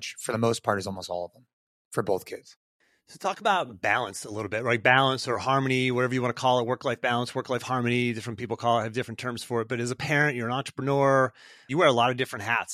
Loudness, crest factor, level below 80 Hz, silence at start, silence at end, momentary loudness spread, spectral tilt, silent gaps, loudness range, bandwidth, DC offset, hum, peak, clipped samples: -26 LUFS; 22 dB; -68 dBFS; 0 s; 0 s; 12 LU; -5 dB/octave; 1.53-1.91 s, 2.56-2.80 s; 6 LU; 15 kHz; under 0.1%; none; -6 dBFS; under 0.1%